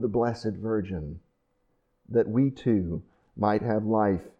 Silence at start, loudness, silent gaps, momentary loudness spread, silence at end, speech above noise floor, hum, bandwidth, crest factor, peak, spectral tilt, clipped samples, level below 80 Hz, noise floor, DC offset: 0 s; -27 LUFS; none; 11 LU; 0.1 s; 45 dB; none; 8.4 kHz; 16 dB; -10 dBFS; -9 dB/octave; under 0.1%; -52 dBFS; -72 dBFS; under 0.1%